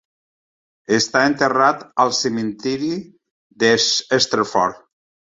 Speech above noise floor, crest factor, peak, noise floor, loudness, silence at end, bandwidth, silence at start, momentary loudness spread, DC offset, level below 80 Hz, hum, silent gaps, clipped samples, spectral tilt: over 72 dB; 18 dB; -2 dBFS; under -90 dBFS; -18 LUFS; 0.6 s; 8 kHz; 0.9 s; 8 LU; under 0.1%; -60 dBFS; none; 3.30-3.50 s; under 0.1%; -3 dB/octave